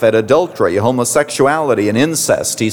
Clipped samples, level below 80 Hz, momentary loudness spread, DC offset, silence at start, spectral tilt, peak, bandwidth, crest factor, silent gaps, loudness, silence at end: under 0.1%; -52 dBFS; 2 LU; 0.2%; 0 s; -4 dB/octave; -2 dBFS; over 20 kHz; 12 dB; none; -14 LUFS; 0 s